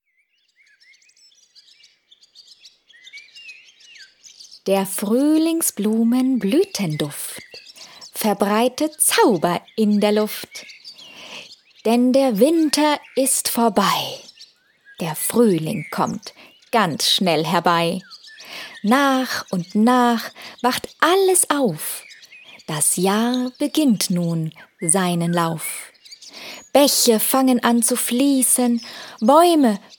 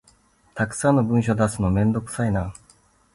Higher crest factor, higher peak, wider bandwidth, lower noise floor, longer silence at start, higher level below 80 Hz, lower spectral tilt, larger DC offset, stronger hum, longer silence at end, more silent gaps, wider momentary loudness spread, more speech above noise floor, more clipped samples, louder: about the same, 20 dB vs 16 dB; first, 0 dBFS vs -8 dBFS; first, 19 kHz vs 11.5 kHz; first, -66 dBFS vs -58 dBFS; first, 3.15 s vs 0.55 s; second, -68 dBFS vs -42 dBFS; second, -3.5 dB/octave vs -7 dB/octave; neither; neither; second, 0.2 s vs 0.65 s; neither; first, 20 LU vs 8 LU; first, 47 dB vs 37 dB; neither; first, -18 LUFS vs -22 LUFS